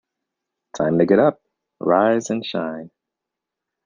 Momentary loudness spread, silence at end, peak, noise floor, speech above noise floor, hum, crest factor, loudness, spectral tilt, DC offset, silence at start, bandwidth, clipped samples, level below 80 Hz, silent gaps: 14 LU; 1 s; -2 dBFS; -84 dBFS; 66 dB; none; 20 dB; -19 LUFS; -6 dB/octave; under 0.1%; 0.75 s; 9.4 kHz; under 0.1%; -62 dBFS; none